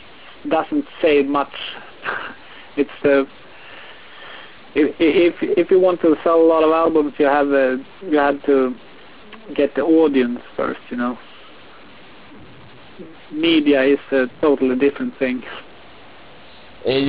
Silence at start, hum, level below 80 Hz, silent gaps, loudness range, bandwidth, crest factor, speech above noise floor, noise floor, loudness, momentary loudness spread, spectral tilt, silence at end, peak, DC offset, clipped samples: 0.45 s; none; -56 dBFS; none; 7 LU; 4 kHz; 14 dB; 26 dB; -43 dBFS; -18 LUFS; 20 LU; -9.5 dB/octave; 0 s; -4 dBFS; 0.8%; under 0.1%